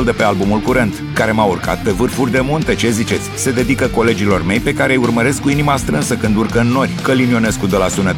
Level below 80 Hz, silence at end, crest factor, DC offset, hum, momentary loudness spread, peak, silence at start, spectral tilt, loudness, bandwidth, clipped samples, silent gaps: -32 dBFS; 0 s; 14 dB; under 0.1%; none; 3 LU; 0 dBFS; 0 s; -5.5 dB/octave; -15 LUFS; 18 kHz; under 0.1%; none